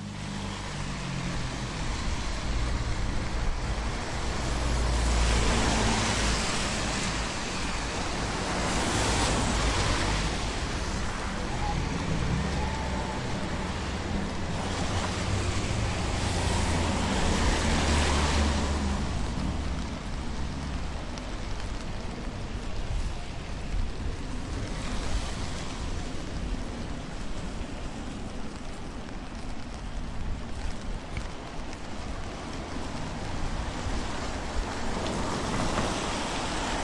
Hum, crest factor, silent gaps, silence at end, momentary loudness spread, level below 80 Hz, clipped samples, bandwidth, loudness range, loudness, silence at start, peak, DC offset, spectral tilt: none; 18 dB; none; 0 s; 12 LU; -34 dBFS; under 0.1%; 11.5 kHz; 10 LU; -31 LUFS; 0 s; -12 dBFS; under 0.1%; -4.5 dB/octave